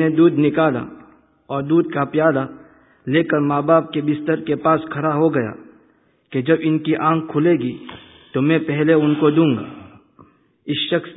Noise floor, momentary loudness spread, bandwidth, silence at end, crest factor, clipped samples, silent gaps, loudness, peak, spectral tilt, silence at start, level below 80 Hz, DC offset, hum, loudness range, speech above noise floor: -58 dBFS; 12 LU; 4 kHz; 0 s; 18 dB; under 0.1%; none; -18 LUFS; -2 dBFS; -12 dB/octave; 0 s; -60 dBFS; under 0.1%; none; 2 LU; 40 dB